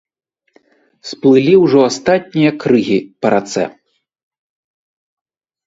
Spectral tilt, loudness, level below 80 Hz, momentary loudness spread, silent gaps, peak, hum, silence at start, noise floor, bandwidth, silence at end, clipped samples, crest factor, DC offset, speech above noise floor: -6 dB/octave; -13 LUFS; -58 dBFS; 12 LU; none; 0 dBFS; none; 1.05 s; -54 dBFS; 7.8 kHz; 2 s; under 0.1%; 16 dB; under 0.1%; 42 dB